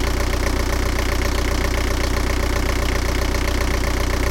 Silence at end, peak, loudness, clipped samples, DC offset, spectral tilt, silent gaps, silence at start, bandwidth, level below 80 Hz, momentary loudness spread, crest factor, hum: 0 s; -6 dBFS; -22 LUFS; under 0.1%; under 0.1%; -4.5 dB/octave; none; 0 s; 17 kHz; -22 dBFS; 0 LU; 14 dB; none